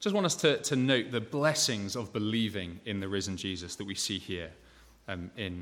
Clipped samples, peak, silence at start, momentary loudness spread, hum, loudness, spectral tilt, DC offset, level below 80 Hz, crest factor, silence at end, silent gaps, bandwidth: under 0.1%; -12 dBFS; 0 s; 13 LU; none; -31 LUFS; -3.5 dB/octave; under 0.1%; -62 dBFS; 20 dB; 0 s; none; 17.5 kHz